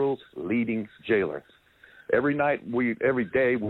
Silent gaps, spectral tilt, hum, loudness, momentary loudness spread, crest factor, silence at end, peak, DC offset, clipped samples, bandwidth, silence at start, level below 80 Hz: none; -9 dB/octave; none; -26 LUFS; 8 LU; 18 dB; 0 s; -10 dBFS; under 0.1%; under 0.1%; 4.1 kHz; 0 s; -60 dBFS